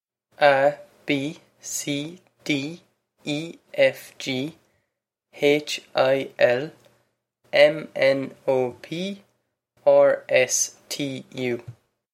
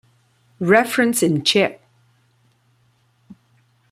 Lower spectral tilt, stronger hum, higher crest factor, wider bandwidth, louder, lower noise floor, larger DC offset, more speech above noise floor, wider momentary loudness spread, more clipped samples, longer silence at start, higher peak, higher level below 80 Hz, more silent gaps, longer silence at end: about the same, -3.5 dB/octave vs -4 dB/octave; neither; about the same, 22 dB vs 20 dB; about the same, 15.5 kHz vs 16 kHz; second, -23 LUFS vs -17 LUFS; first, -80 dBFS vs -61 dBFS; neither; first, 58 dB vs 44 dB; first, 15 LU vs 6 LU; neither; second, 0.4 s vs 0.6 s; about the same, -2 dBFS vs -2 dBFS; second, -74 dBFS vs -64 dBFS; neither; second, 0.4 s vs 0.6 s